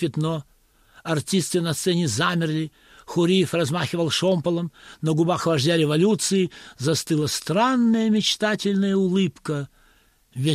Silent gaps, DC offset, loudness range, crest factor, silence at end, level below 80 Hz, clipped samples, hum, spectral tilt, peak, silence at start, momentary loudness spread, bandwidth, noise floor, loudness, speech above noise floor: none; under 0.1%; 2 LU; 14 dB; 0 s; -60 dBFS; under 0.1%; none; -5 dB/octave; -8 dBFS; 0 s; 10 LU; 15 kHz; -59 dBFS; -22 LUFS; 37 dB